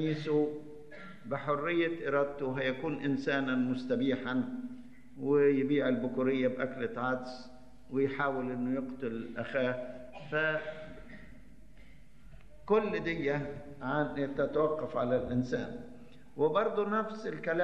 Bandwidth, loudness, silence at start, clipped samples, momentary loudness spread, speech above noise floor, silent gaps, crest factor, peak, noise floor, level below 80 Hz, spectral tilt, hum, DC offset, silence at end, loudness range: 7.8 kHz; -33 LUFS; 0 s; under 0.1%; 18 LU; 25 dB; none; 16 dB; -16 dBFS; -57 dBFS; -62 dBFS; -7.5 dB/octave; none; 0.3%; 0 s; 5 LU